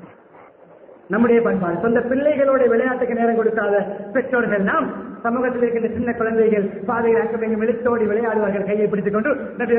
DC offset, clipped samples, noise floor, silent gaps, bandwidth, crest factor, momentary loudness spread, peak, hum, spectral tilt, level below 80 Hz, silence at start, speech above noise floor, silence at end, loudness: under 0.1%; under 0.1%; -46 dBFS; none; 3.5 kHz; 14 dB; 6 LU; -6 dBFS; none; -12 dB/octave; -54 dBFS; 0 s; 28 dB; 0 s; -19 LUFS